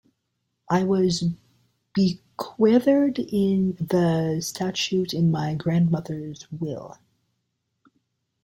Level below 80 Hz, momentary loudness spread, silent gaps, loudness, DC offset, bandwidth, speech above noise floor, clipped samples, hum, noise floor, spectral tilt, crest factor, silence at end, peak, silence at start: -60 dBFS; 14 LU; none; -23 LUFS; under 0.1%; 16.5 kHz; 54 dB; under 0.1%; none; -77 dBFS; -6.5 dB/octave; 16 dB; 1.55 s; -8 dBFS; 0.7 s